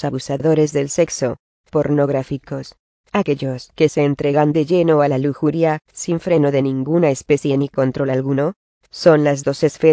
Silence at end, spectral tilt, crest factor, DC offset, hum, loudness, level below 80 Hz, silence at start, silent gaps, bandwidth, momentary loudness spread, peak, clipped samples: 0 s; -6.5 dB/octave; 16 dB; under 0.1%; none; -18 LUFS; -52 dBFS; 0 s; 1.39-1.64 s, 2.79-3.04 s, 8.56-8.81 s; 8 kHz; 9 LU; 0 dBFS; under 0.1%